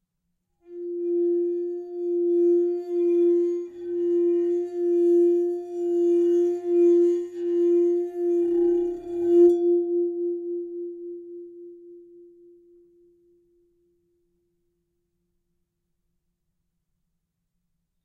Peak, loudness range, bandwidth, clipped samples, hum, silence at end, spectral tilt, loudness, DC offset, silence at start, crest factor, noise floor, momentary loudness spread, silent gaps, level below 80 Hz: -10 dBFS; 10 LU; 2.9 kHz; under 0.1%; none; 6 s; -7.5 dB/octave; -23 LUFS; under 0.1%; 0.7 s; 16 dB; -78 dBFS; 15 LU; none; -68 dBFS